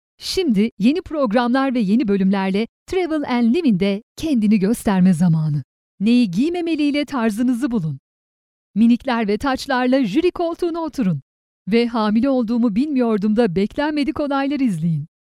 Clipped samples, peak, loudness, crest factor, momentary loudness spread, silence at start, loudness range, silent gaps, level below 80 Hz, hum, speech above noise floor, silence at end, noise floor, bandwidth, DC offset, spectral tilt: under 0.1%; -4 dBFS; -19 LUFS; 14 dB; 7 LU; 0.2 s; 2 LU; 0.72-0.77 s, 2.69-2.86 s, 4.03-4.15 s, 5.64-5.98 s, 7.99-8.74 s, 11.22-11.65 s; -48 dBFS; none; over 72 dB; 0.2 s; under -90 dBFS; 14 kHz; under 0.1%; -7 dB/octave